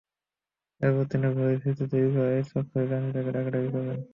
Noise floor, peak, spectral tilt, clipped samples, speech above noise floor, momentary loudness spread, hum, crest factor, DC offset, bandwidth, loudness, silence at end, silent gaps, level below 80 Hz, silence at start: under -90 dBFS; -10 dBFS; -10.5 dB/octave; under 0.1%; over 64 dB; 4 LU; none; 16 dB; under 0.1%; 5.6 kHz; -27 LUFS; 0.05 s; none; -64 dBFS; 0.8 s